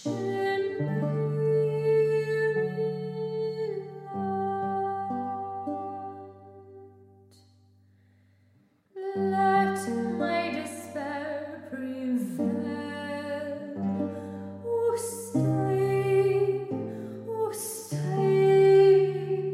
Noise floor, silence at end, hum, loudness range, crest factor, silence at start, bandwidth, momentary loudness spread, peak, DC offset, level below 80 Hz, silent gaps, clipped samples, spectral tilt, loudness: -64 dBFS; 0 s; none; 10 LU; 18 dB; 0 s; 14.5 kHz; 13 LU; -10 dBFS; under 0.1%; -78 dBFS; none; under 0.1%; -6.5 dB/octave; -28 LUFS